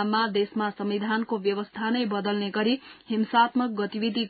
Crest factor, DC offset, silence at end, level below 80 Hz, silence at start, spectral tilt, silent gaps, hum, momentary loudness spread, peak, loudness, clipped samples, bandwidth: 18 dB; under 0.1%; 0 s; -72 dBFS; 0 s; -10 dB/octave; none; none; 7 LU; -8 dBFS; -26 LUFS; under 0.1%; 4.8 kHz